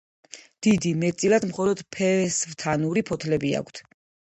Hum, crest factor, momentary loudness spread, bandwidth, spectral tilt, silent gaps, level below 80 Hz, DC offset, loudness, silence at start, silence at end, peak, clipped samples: none; 16 dB; 19 LU; 9.2 kHz; -5 dB/octave; none; -58 dBFS; under 0.1%; -24 LUFS; 0.35 s; 0.4 s; -8 dBFS; under 0.1%